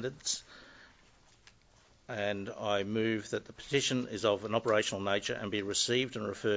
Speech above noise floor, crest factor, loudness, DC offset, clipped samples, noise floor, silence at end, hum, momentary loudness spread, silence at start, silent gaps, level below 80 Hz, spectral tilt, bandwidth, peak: 31 dB; 20 dB; -33 LUFS; under 0.1%; under 0.1%; -64 dBFS; 0 s; none; 8 LU; 0 s; none; -64 dBFS; -3.5 dB/octave; 8 kHz; -14 dBFS